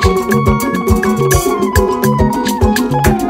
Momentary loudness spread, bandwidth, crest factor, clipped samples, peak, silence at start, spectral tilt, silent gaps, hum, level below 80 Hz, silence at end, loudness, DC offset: 1 LU; 16.5 kHz; 12 dB; under 0.1%; 0 dBFS; 0 s; -5.5 dB/octave; none; none; -22 dBFS; 0 s; -13 LUFS; under 0.1%